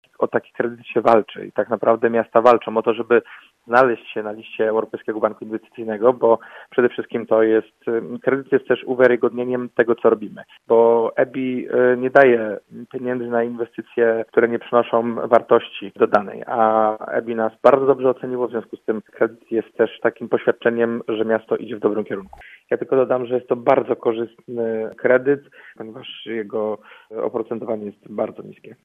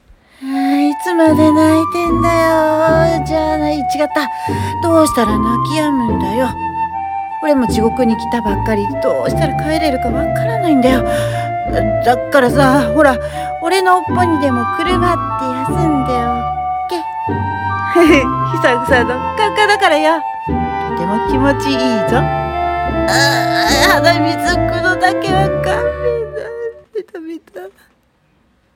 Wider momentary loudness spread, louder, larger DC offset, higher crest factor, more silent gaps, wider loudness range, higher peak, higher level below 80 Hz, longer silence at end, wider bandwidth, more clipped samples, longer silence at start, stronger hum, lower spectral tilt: first, 13 LU vs 9 LU; second, -20 LUFS vs -14 LUFS; neither; first, 20 dB vs 14 dB; neither; about the same, 4 LU vs 3 LU; about the same, 0 dBFS vs 0 dBFS; second, -66 dBFS vs -32 dBFS; second, 0.1 s vs 1.05 s; second, 5.6 kHz vs 17.5 kHz; neither; second, 0.2 s vs 0.4 s; neither; first, -7.5 dB/octave vs -5.5 dB/octave